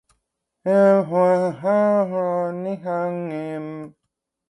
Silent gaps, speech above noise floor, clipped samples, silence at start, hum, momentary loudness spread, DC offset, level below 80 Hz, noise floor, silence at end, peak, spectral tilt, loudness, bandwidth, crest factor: none; 59 dB; under 0.1%; 0.65 s; none; 14 LU; under 0.1%; -72 dBFS; -79 dBFS; 0.6 s; -4 dBFS; -8.5 dB/octave; -21 LUFS; 11 kHz; 16 dB